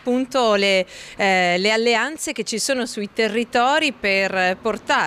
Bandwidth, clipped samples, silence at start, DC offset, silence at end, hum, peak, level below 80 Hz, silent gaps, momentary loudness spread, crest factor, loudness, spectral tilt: 15.5 kHz; under 0.1%; 0.05 s; under 0.1%; 0 s; none; -8 dBFS; -58 dBFS; none; 7 LU; 12 dB; -19 LUFS; -3 dB/octave